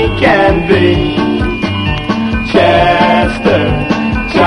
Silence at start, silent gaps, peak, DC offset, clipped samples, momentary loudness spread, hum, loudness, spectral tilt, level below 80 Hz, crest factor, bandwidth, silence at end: 0 s; none; 0 dBFS; under 0.1%; 0.1%; 6 LU; none; -11 LUFS; -7 dB/octave; -24 dBFS; 10 dB; 11 kHz; 0 s